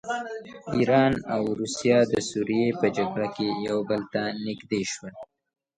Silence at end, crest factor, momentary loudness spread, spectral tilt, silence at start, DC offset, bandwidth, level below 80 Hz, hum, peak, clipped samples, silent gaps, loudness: 0.55 s; 18 dB; 11 LU; -5 dB/octave; 0.05 s; under 0.1%; 10.5 kHz; -58 dBFS; none; -8 dBFS; under 0.1%; none; -26 LUFS